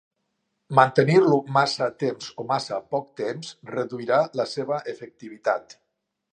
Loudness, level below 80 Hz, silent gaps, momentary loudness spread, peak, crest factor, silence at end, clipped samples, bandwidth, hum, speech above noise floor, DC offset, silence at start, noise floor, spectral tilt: -23 LUFS; -72 dBFS; none; 14 LU; -2 dBFS; 24 dB; 0.7 s; under 0.1%; 10 kHz; none; 53 dB; under 0.1%; 0.7 s; -77 dBFS; -6 dB/octave